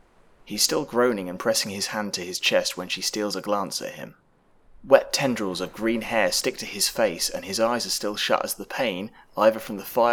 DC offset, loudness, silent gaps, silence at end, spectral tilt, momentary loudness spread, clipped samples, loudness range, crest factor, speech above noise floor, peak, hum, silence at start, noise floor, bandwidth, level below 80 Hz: under 0.1%; -24 LUFS; none; 0 s; -2.5 dB/octave; 8 LU; under 0.1%; 2 LU; 24 dB; 32 dB; 0 dBFS; none; 0.45 s; -57 dBFS; over 20 kHz; -58 dBFS